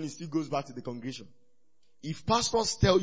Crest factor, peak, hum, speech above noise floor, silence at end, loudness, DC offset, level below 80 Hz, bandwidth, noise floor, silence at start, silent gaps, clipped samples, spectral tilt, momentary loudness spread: 20 dB; -10 dBFS; none; 47 dB; 0 s; -30 LUFS; 0.2%; -48 dBFS; 8 kHz; -76 dBFS; 0 s; none; under 0.1%; -4.5 dB/octave; 15 LU